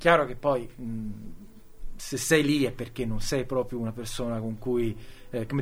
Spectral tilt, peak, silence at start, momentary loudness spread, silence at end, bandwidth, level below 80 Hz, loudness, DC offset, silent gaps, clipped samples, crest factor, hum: -5 dB/octave; -4 dBFS; 0 s; 15 LU; 0 s; 16.5 kHz; -42 dBFS; -28 LUFS; under 0.1%; none; under 0.1%; 24 dB; none